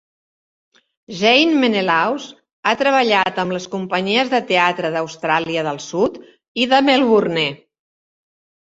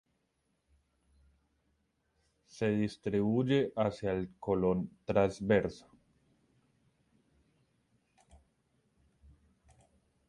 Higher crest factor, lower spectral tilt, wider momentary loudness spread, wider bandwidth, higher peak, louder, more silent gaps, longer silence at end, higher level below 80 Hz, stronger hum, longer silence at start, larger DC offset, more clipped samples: about the same, 18 dB vs 22 dB; second, -4.5 dB/octave vs -7.5 dB/octave; first, 10 LU vs 7 LU; second, 8 kHz vs 11 kHz; first, -2 dBFS vs -14 dBFS; first, -17 LUFS vs -32 LUFS; first, 2.53-2.63 s, 6.48-6.55 s vs none; second, 1.1 s vs 4.5 s; about the same, -62 dBFS vs -60 dBFS; neither; second, 1.1 s vs 2.55 s; neither; neither